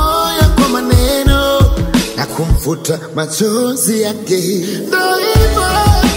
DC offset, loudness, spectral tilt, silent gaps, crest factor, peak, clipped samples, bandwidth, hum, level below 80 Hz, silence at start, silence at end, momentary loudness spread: under 0.1%; -13 LUFS; -4.5 dB/octave; none; 12 dB; 0 dBFS; under 0.1%; 16.5 kHz; none; -18 dBFS; 0 s; 0 s; 7 LU